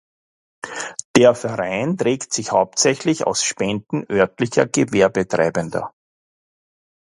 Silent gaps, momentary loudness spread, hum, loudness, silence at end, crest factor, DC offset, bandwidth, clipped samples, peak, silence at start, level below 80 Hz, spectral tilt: 1.05-1.14 s; 13 LU; none; -19 LUFS; 1.3 s; 20 dB; under 0.1%; 11.5 kHz; under 0.1%; 0 dBFS; 0.65 s; -56 dBFS; -4 dB/octave